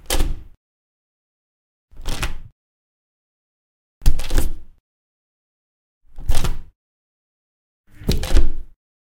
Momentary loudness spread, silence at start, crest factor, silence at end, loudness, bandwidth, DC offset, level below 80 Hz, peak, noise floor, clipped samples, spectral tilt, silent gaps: 16 LU; 0.1 s; 18 dB; 0.5 s; -26 LUFS; 16.5 kHz; under 0.1%; -22 dBFS; 0 dBFS; under -90 dBFS; under 0.1%; -4.5 dB/octave; 0.57-1.88 s, 2.52-4.01 s, 4.80-6.01 s, 6.75-7.84 s